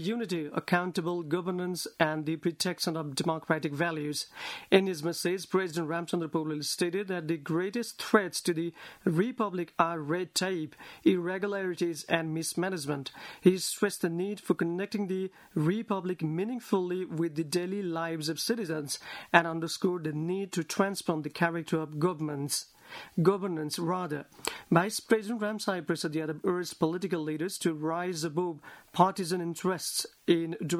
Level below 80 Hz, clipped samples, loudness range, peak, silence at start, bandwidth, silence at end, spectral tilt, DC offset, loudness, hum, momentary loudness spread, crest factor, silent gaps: -74 dBFS; under 0.1%; 2 LU; -4 dBFS; 0 s; 16 kHz; 0 s; -5 dB/octave; under 0.1%; -31 LUFS; none; 7 LU; 28 dB; none